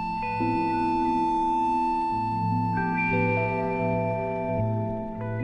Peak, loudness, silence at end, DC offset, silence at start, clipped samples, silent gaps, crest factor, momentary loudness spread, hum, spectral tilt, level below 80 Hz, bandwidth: -14 dBFS; -26 LUFS; 0 s; under 0.1%; 0 s; under 0.1%; none; 12 dB; 4 LU; none; -8.5 dB/octave; -46 dBFS; 10 kHz